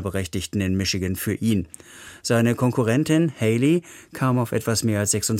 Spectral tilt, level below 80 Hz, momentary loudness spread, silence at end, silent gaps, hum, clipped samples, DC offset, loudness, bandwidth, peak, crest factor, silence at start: -5 dB/octave; -50 dBFS; 8 LU; 0 s; none; none; under 0.1%; under 0.1%; -22 LUFS; 16.5 kHz; -6 dBFS; 16 dB; 0 s